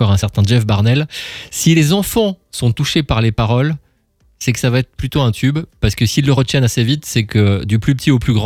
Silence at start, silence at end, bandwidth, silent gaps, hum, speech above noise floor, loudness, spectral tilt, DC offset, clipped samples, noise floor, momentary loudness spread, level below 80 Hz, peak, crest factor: 0 s; 0 s; 16 kHz; none; none; 42 dB; -15 LUFS; -5.5 dB/octave; under 0.1%; under 0.1%; -56 dBFS; 6 LU; -34 dBFS; 0 dBFS; 14 dB